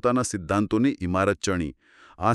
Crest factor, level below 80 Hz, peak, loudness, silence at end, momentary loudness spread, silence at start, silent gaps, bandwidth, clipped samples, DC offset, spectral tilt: 18 dB; -48 dBFS; -6 dBFS; -25 LUFS; 0 s; 5 LU; 0.05 s; none; 12.5 kHz; under 0.1%; under 0.1%; -5.5 dB/octave